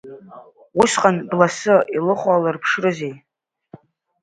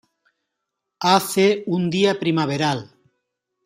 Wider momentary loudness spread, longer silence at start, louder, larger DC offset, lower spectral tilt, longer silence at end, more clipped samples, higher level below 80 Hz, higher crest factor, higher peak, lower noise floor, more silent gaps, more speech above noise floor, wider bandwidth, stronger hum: first, 12 LU vs 6 LU; second, 0.05 s vs 1 s; about the same, -18 LUFS vs -20 LUFS; neither; about the same, -4.5 dB/octave vs -5 dB/octave; first, 1.05 s vs 0.8 s; neither; about the same, -60 dBFS vs -64 dBFS; about the same, 20 dB vs 20 dB; about the same, 0 dBFS vs -2 dBFS; second, -46 dBFS vs -80 dBFS; neither; second, 29 dB vs 61 dB; second, 11 kHz vs 15.5 kHz; neither